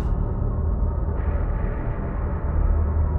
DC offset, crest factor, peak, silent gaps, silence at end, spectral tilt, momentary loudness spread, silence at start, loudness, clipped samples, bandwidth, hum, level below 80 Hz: under 0.1%; 12 dB; -10 dBFS; none; 0 s; -12 dB/octave; 5 LU; 0 s; -26 LUFS; under 0.1%; 2.8 kHz; none; -24 dBFS